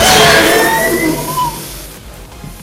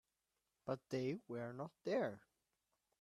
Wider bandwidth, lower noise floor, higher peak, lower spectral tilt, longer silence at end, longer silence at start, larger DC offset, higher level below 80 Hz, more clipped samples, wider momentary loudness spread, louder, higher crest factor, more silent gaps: first, over 20 kHz vs 13.5 kHz; second, -31 dBFS vs -89 dBFS; first, 0 dBFS vs -28 dBFS; second, -2.5 dB/octave vs -7 dB/octave; second, 0 s vs 0.85 s; second, 0 s vs 0.65 s; neither; first, -32 dBFS vs -86 dBFS; first, 0.6% vs under 0.1%; first, 24 LU vs 9 LU; first, -10 LUFS vs -45 LUFS; second, 12 dB vs 18 dB; neither